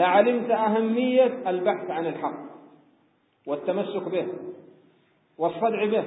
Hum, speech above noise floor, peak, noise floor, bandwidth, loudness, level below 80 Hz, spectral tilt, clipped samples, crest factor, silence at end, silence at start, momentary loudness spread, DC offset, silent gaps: none; 41 dB; -6 dBFS; -65 dBFS; 4 kHz; -25 LUFS; -80 dBFS; -10 dB/octave; under 0.1%; 20 dB; 0 s; 0 s; 15 LU; under 0.1%; none